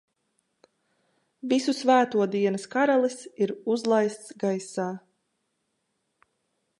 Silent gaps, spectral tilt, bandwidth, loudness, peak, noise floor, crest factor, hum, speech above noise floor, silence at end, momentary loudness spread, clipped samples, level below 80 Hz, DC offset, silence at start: none; -5 dB/octave; 11.5 kHz; -25 LUFS; -8 dBFS; -77 dBFS; 20 dB; none; 52 dB; 1.8 s; 10 LU; under 0.1%; -82 dBFS; under 0.1%; 1.45 s